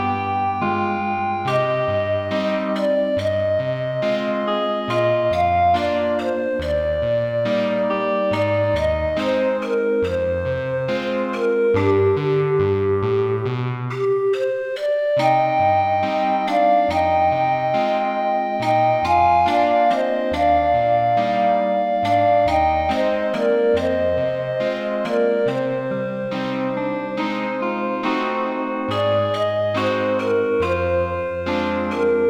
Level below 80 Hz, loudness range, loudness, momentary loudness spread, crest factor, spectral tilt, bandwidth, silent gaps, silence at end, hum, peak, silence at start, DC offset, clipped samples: -44 dBFS; 4 LU; -20 LUFS; 6 LU; 14 dB; -7 dB/octave; 10 kHz; none; 0 s; none; -6 dBFS; 0 s; under 0.1%; under 0.1%